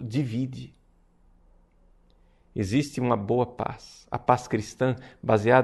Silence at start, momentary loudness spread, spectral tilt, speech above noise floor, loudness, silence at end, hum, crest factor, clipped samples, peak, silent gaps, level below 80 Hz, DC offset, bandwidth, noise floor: 0 s; 12 LU; -7 dB/octave; 35 dB; -27 LUFS; 0 s; none; 24 dB; under 0.1%; -4 dBFS; none; -56 dBFS; under 0.1%; 12 kHz; -60 dBFS